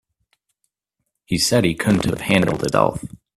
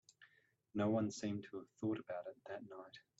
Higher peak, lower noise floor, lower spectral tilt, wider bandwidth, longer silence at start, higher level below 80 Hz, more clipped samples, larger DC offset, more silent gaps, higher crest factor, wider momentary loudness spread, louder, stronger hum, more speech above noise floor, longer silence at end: first, -2 dBFS vs -26 dBFS; about the same, -77 dBFS vs -74 dBFS; second, -5 dB/octave vs -6.5 dB/octave; first, 15 kHz vs 8 kHz; first, 1.3 s vs 0.2 s; first, -46 dBFS vs -82 dBFS; neither; neither; neither; about the same, 20 dB vs 18 dB; second, 5 LU vs 15 LU; first, -19 LUFS vs -43 LUFS; neither; first, 59 dB vs 32 dB; about the same, 0.2 s vs 0.2 s